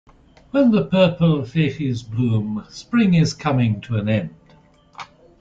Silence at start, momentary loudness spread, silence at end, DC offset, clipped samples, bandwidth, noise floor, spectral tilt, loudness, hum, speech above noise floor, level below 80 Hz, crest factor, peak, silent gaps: 0.55 s; 17 LU; 0.35 s; under 0.1%; under 0.1%; 7.8 kHz; -52 dBFS; -7.5 dB/octave; -19 LUFS; none; 34 dB; -50 dBFS; 16 dB; -4 dBFS; none